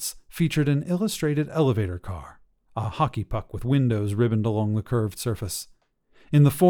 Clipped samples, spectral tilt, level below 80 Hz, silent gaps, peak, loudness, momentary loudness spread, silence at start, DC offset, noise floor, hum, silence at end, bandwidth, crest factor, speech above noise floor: under 0.1%; -6.5 dB/octave; -46 dBFS; none; -6 dBFS; -25 LUFS; 10 LU; 0 s; under 0.1%; -60 dBFS; none; 0 s; 19 kHz; 18 dB; 37 dB